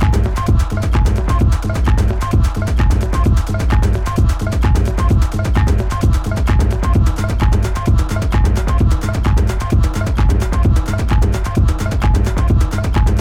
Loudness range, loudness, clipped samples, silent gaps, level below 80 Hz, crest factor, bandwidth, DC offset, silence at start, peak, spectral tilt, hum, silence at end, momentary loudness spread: 0 LU; -16 LUFS; under 0.1%; none; -16 dBFS; 10 dB; 15 kHz; under 0.1%; 0 s; -4 dBFS; -7 dB/octave; none; 0 s; 2 LU